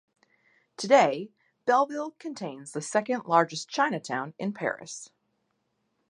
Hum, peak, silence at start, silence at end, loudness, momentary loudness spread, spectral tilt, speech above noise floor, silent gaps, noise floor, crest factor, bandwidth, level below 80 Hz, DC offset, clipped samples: none; -6 dBFS; 0.8 s; 1.05 s; -27 LUFS; 16 LU; -4 dB/octave; 49 dB; none; -76 dBFS; 22 dB; 11 kHz; -82 dBFS; under 0.1%; under 0.1%